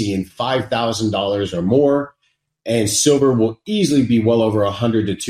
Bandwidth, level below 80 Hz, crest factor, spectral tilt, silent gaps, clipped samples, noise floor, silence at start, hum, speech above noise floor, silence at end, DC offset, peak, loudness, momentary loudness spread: 16 kHz; -52 dBFS; 16 dB; -5 dB/octave; none; under 0.1%; -67 dBFS; 0 s; none; 51 dB; 0 s; under 0.1%; -2 dBFS; -17 LUFS; 7 LU